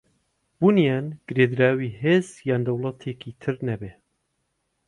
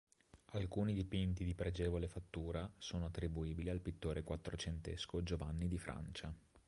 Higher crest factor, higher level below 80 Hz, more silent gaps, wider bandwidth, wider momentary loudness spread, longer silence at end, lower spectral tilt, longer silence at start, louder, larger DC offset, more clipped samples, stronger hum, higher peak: about the same, 18 dB vs 16 dB; second, -60 dBFS vs -50 dBFS; neither; about the same, 11 kHz vs 11.5 kHz; first, 14 LU vs 7 LU; first, 0.95 s vs 0.1 s; about the same, -7.5 dB/octave vs -6.5 dB/octave; first, 0.6 s vs 0.35 s; first, -23 LUFS vs -44 LUFS; neither; neither; neither; first, -6 dBFS vs -26 dBFS